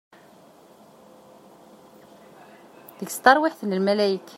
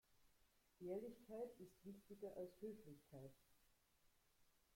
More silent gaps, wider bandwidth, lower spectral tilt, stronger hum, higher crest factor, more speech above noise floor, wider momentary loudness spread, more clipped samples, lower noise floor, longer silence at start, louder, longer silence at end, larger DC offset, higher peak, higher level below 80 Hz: neither; about the same, 16 kHz vs 16.5 kHz; second, -4.5 dB/octave vs -7 dB/octave; neither; first, 24 dB vs 18 dB; first, 30 dB vs 24 dB; first, 14 LU vs 10 LU; neither; second, -52 dBFS vs -80 dBFS; first, 3 s vs 0.1 s; first, -21 LUFS vs -57 LUFS; about the same, 0.2 s vs 0.15 s; neither; first, -2 dBFS vs -40 dBFS; first, -72 dBFS vs -84 dBFS